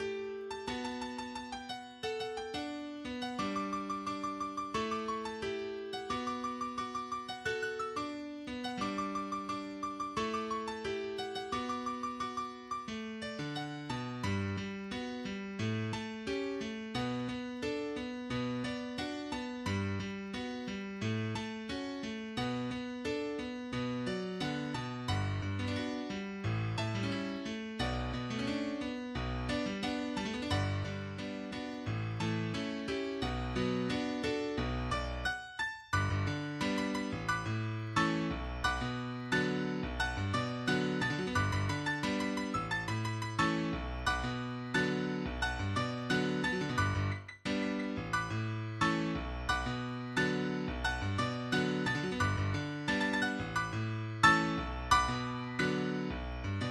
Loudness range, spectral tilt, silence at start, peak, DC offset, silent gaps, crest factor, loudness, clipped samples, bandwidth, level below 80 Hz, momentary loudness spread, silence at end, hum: 5 LU; -5.5 dB/octave; 0 s; -10 dBFS; under 0.1%; none; 24 dB; -36 LUFS; under 0.1%; 13 kHz; -50 dBFS; 7 LU; 0 s; none